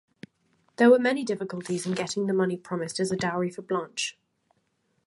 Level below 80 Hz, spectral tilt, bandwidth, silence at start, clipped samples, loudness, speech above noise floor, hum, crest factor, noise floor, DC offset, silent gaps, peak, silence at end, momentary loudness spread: -70 dBFS; -5 dB/octave; 11.5 kHz; 0.8 s; under 0.1%; -26 LUFS; 47 dB; none; 20 dB; -72 dBFS; under 0.1%; none; -8 dBFS; 0.95 s; 12 LU